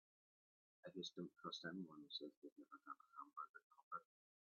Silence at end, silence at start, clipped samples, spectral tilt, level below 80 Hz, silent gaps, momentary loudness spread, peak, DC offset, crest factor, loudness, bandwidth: 0.4 s; 0.85 s; under 0.1%; -2.5 dB/octave; under -90 dBFS; 2.37-2.42 s, 2.52-2.56 s, 3.49-3.54 s, 3.63-3.70 s, 3.83-3.91 s; 11 LU; -36 dBFS; under 0.1%; 22 dB; -55 LUFS; 6.8 kHz